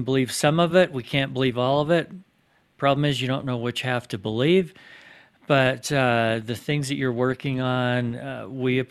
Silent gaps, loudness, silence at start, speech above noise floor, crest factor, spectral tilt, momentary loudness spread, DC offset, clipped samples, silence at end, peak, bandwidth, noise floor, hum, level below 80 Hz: none; -23 LUFS; 0 s; 41 dB; 20 dB; -5.5 dB/octave; 7 LU; under 0.1%; under 0.1%; 0.05 s; -4 dBFS; 14 kHz; -64 dBFS; none; -58 dBFS